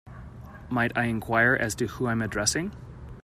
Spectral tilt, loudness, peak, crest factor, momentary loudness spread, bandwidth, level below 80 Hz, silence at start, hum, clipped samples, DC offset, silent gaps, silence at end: -4 dB/octave; -26 LUFS; -10 dBFS; 18 dB; 22 LU; 15.5 kHz; -48 dBFS; 0.05 s; none; under 0.1%; under 0.1%; none; 0.05 s